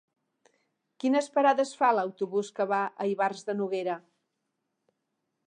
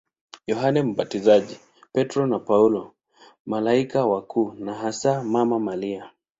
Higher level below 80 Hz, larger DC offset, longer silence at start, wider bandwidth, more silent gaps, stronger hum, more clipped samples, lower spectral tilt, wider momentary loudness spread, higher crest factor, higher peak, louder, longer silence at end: second, -88 dBFS vs -64 dBFS; neither; first, 1.05 s vs 0.5 s; first, 10 kHz vs 7.8 kHz; second, none vs 3.40-3.45 s; neither; neither; second, -5 dB/octave vs -6.5 dB/octave; second, 8 LU vs 11 LU; about the same, 20 dB vs 20 dB; second, -10 dBFS vs -4 dBFS; second, -28 LUFS vs -23 LUFS; first, 1.45 s vs 0.3 s